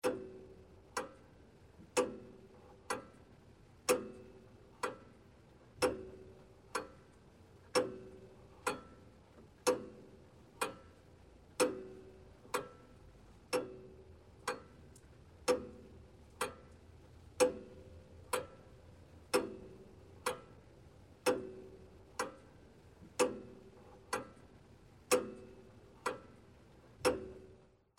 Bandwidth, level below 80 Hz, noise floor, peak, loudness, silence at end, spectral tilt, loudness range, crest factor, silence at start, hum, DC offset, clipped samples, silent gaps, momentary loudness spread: 16 kHz; -66 dBFS; -63 dBFS; -16 dBFS; -40 LUFS; 0.4 s; -3 dB/octave; 3 LU; 26 dB; 0.05 s; none; under 0.1%; under 0.1%; none; 25 LU